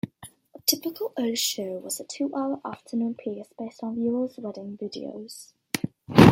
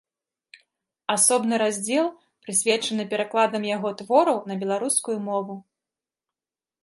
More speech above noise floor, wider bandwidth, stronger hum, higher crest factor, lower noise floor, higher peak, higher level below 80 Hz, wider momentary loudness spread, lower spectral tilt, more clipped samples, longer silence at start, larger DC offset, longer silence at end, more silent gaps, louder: second, 19 dB vs over 67 dB; first, 16.5 kHz vs 12 kHz; neither; about the same, 24 dB vs 20 dB; second, -50 dBFS vs under -90 dBFS; first, -2 dBFS vs -6 dBFS; first, -56 dBFS vs -78 dBFS; first, 14 LU vs 10 LU; first, -5 dB/octave vs -2.5 dB/octave; neither; second, 0.05 s vs 1.1 s; neither; second, 0 s vs 1.2 s; neither; second, -28 LUFS vs -23 LUFS